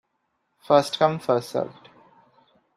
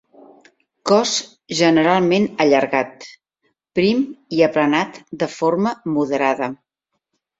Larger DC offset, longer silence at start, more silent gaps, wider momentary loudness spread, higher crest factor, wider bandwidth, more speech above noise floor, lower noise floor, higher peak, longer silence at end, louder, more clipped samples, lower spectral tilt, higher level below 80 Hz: neither; second, 0.7 s vs 0.85 s; neither; about the same, 10 LU vs 11 LU; about the same, 22 dB vs 18 dB; first, 14 kHz vs 7.8 kHz; second, 52 dB vs 59 dB; about the same, -74 dBFS vs -77 dBFS; about the same, -4 dBFS vs -2 dBFS; first, 1.05 s vs 0.85 s; second, -23 LUFS vs -18 LUFS; neither; about the same, -5.5 dB/octave vs -4.5 dB/octave; second, -68 dBFS vs -62 dBFS